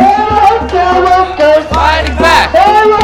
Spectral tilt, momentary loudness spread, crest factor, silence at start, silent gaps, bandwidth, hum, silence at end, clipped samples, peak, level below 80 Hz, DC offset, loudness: -5 dB/octave; 4 LU; 8 dB; 0 s; none; 17 kHz; none; 0 s; 0.9%; 0 dBFS; -22 dBFS; under 0.1%; -8 LUFS